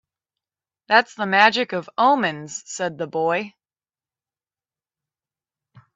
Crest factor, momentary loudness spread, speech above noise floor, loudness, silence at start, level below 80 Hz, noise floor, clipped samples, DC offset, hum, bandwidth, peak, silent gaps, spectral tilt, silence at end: 24 dB; 13 LU; over 70 dB; -20 LUFS; 0.9 s; -74 dBFS; under -90 dBFS; under 0.1%; under 0.1%; none; 8 kHz; 0 dBFS; none; -3.5 dB/octave; 2.45 s